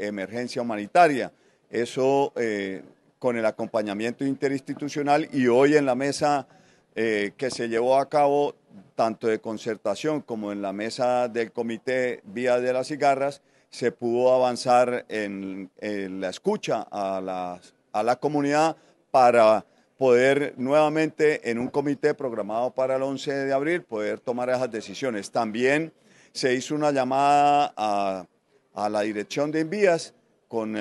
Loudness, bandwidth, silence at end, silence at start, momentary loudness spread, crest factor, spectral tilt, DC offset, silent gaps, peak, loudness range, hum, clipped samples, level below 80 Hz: -24 LUFS; 12 kHz; 0 s; 0 s; 12 LU; 20 dB; -5 dB/octave; under 0.1%; none; -6 dBFS; 5 LU; none; under 0.1%; -76 dBFS